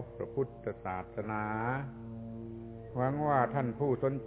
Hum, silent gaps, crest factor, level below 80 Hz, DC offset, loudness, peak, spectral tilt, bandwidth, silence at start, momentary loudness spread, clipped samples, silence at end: none; none; 20 dB; -58 dBFS; under 0.1%; -35 LUFS; -14 dBFS; -8.5 dB/octave; 4 kHz; 0 s; 14 LU; under 0.1%; 0 s